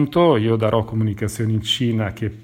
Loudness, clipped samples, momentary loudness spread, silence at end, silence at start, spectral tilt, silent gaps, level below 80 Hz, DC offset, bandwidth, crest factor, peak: -20 LUFS; under 0.1%; 7 LU; 0 s; 0 s; -6.5 dB/octave; none; -48 dBFS; under 0.1%; 16 kHz; 14 dB; -4 dBFS